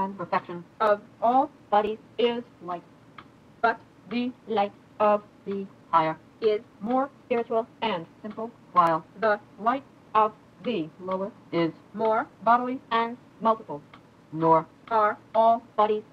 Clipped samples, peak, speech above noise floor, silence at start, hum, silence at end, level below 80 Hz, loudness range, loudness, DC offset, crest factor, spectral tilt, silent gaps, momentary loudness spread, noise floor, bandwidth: under 0.1%; -8 dBFS; 24 dB; 0 s; none; 0.1 s; -70 dBFS; 3 LU; -27 LUFS; under 0.1%; 20 dB; -7 dB/octave; none; 13 LU; -50 dBFS; 7.8 kHz